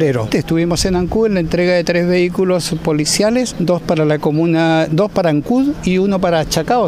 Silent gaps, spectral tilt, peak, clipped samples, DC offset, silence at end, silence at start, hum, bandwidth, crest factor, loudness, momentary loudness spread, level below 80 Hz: none; -5.5 dB/octave; -2 dBFS; under 0.1%; under 0.1%; 0 s; 0 s; none; 16 kHz; 12 dB; -15 LUFS; 3 LU; -36 dBFS